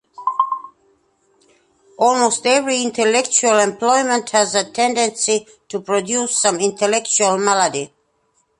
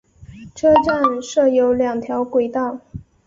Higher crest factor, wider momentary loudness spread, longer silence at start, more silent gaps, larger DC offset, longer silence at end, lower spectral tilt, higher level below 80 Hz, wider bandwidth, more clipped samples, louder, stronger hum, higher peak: about the same, 18 dB vs 16 dB; second, 7 LU vs 15 LU; about the same, 0.2 s vs 0.2 s; neither; neither; first, 0.75 s vs 0.25 s; second, -1.5 dB/octave vs -5.5 dB/octave; second, -66 dBFS vs -48 dBFS; first, 11.5 kHz vs 7.6 kHz; neither; about the same, -17 LUFS vs -18 LUFS; neither; about the same, 0 dBFS vs -2 dBFS